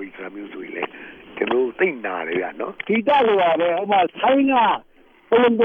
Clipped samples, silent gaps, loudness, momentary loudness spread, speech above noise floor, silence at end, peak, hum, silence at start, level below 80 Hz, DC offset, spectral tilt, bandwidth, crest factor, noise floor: under 0.1%; none; -20 LUFS; 17 LU; 22 dB; 0 s; -6 dBFS; none; 0 s; -62 dBFS; under 0.1%; -7.5 dB/octave; 4.7 kHz; 14 dB; -40 dBFS